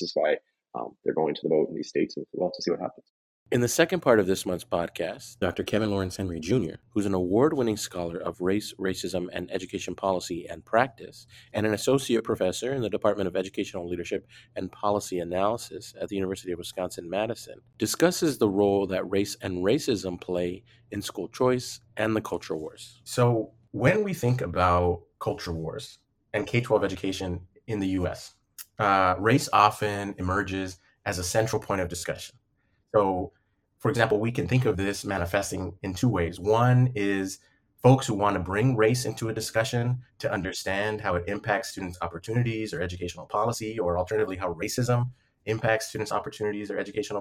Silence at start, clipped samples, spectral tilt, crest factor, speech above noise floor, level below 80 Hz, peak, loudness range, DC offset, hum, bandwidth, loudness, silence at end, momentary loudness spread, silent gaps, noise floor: 0 s; under 0.1%; -5.5 dB/octave; 22 dB; 44 dB; -58 dBFS; -4 dBFS; 5 LU; under 0.1%; none; 16 kHz; -27 LUFS; 0 s; 12 LU; 3.10-3.46 s; -71 dBFS